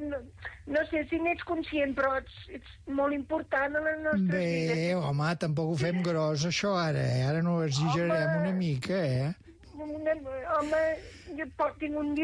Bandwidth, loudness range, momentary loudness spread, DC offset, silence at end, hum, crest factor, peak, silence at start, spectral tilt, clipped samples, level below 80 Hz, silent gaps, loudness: 10.5 kHz; 3 LU; 11 LU; under 0.1%; 0 s; none; 12 dB; -18 dBFS; 0 s; -6 dB/octave; under 0.1%; -56 dBFS; none; -30 LUFS